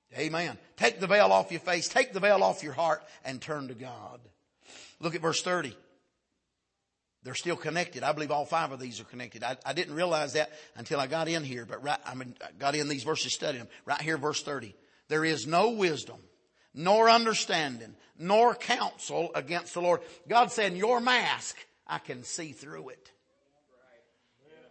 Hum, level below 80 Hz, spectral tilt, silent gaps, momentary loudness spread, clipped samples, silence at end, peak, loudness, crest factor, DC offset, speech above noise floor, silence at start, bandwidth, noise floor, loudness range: none; -78 dBFS; -3.5 dB/octave; none; 17 LU; under 0.1%; 1.75 s; -8 dBFS; -29 LUFS; 24 dB; under 0.1%; 53 dB; 0.1 s; 8.8 kHz; -83 dBFS; 9 LU